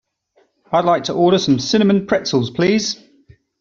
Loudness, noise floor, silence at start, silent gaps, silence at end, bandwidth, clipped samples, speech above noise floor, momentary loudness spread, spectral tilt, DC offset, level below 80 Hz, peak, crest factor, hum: -16 LUFS; -60 dBFS; 0.7 s; none; 0.65 s; 7.6 kHz; under 0.1%; 44 dB; 5 LU; -5 dB/octave; under 0.1%; -56 dBFS; -2 dBFS; 16 dB; none